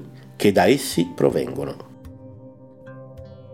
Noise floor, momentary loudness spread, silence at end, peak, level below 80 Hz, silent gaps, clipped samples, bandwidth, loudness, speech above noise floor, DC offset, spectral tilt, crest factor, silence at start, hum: -44 dBFS; 25 LU; 0 s; -2 dBFS; -54 dBFS; none; under 0.1%; 17 kHz; -20 LUFS; 24 dB; 0.1%; -5 dB/octave; 22 dB; 0 s; none